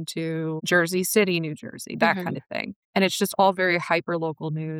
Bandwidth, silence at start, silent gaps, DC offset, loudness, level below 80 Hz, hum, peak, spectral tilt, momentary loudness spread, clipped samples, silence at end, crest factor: 18 kHz; 0 s; 2.76-2.93 s; under 0.1%; -24 LUFS; -72 dBFS; none; -6 dBFS; -4.5 dB/octave; 11 LU; under 0.1%; 0 s; 18 dB